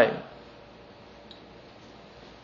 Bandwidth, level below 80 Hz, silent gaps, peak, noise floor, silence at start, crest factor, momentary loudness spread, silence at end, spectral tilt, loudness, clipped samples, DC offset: 7.2 kHz; -62 dBFS; none; -8 dBFS; -50 dBFS; 0 s; 26 dB; 11 LU; 2.1 s; -3 dB/octave; -30 LUFS; under 0.1%; under 0.1%